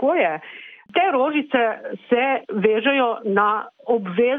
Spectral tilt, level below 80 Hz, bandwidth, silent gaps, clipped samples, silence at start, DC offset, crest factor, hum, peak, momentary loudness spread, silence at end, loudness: -8.5 dB/octave; -68 dBFS; 3.9 kHz; none; under 0.1%; 0 s; under 0.1%; 14 dB; none; -6 dBFS; 8 LU; 0 s; -20 LUFS